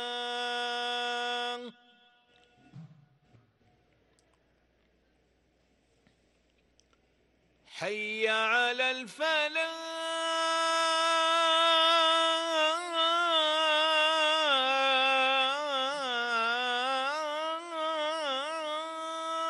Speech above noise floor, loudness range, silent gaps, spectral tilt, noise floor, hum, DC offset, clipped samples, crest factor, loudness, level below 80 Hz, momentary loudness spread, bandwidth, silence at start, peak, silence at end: 40 dB; 12 LU; none; -0.5 dB/octave; -70 dBFS; none; under 0.1%; under 0.1%; 16 dB; -28 LUFS; -80 dBFS; 10 LU; 12 kHz; 0 s; -16 dBFS; 0 s